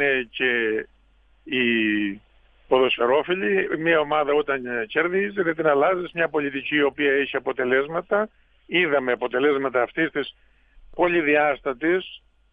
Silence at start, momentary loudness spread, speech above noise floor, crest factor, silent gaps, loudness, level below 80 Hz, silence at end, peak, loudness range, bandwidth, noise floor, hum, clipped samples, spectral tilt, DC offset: 0 s; 6 LU; 36 dB; 18 dB; none; -22 LUFS; -58 dBFS; 0.35 s; -6 dBFS; 2 LU; 4.7 kHz; -58 dBFS; none; under 0.1%; -7.5 dB/octave; under 0.1%